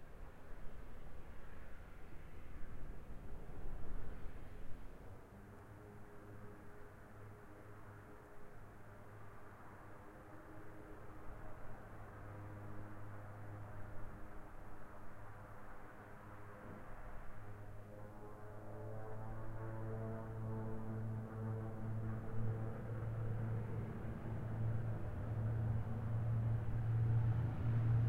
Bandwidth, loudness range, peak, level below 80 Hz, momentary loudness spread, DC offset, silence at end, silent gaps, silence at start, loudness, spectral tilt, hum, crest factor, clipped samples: 3.9 kHz; 16 LU; -26 dBFS; -54 dBFS; 18 LU; under 0.1%; 0 s; none; 0 s; -46 LUFS; -9 dB/octave; none; 16 dB; under 0.1%